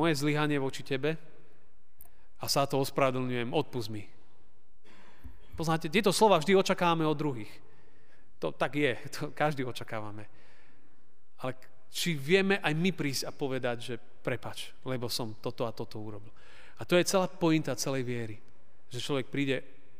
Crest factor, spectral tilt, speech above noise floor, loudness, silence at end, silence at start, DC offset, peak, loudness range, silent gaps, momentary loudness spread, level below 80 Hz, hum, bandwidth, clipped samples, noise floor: 22 dB; -5 dB/octave; 39 dB; -31 LUFS; 0.4 s; 0 s; 1%; -10 dBFS; 7 LU; none; 16 LU; -64 dBFS; none; 15.5 kHz; under 0.1%; -70 dBFS